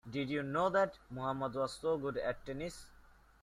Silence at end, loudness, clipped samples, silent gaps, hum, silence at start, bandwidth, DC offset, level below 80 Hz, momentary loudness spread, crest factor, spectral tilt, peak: 0.3 s; -37 LUFS; under 0.1%; none; none; 0.05 s; 13.5 kHz; under 0.1%; -62 dBFS; 11 LU; 18 dB; -6 dB/octave; -20 dBFS